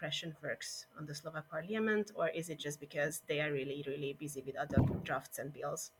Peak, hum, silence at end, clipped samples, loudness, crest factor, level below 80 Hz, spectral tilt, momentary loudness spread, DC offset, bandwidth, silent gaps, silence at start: -18 dBFS; none; 0.1 s; under 0.1%; -39 LUFS; 20 dB; -58 dBFS; -5 dB/octave; 10 LU; under 0.1%; 18 kHz; none; 0 s